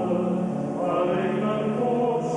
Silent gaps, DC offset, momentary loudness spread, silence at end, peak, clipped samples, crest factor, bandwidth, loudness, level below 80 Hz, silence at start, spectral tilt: none; under 0.1%; 3 LU; 0 s; -12 dBFS; under 0.1%; 12 dB; 10.5 kHz; -25 LUFS; -60 dBFS; 0 s; -8 dB/octave